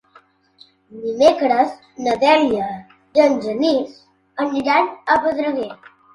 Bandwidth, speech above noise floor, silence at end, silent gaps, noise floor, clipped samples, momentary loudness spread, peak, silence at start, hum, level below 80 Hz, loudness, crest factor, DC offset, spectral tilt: 11 kHz; 35 dB; 0.4 s; none; -53 dBFS; under 0.1%; 14 LU; 0 dBFS; 0.9 s; none; -58 dBFS; -18 LUFS; 18 dB; under 0.1%; -4.5 dB/octave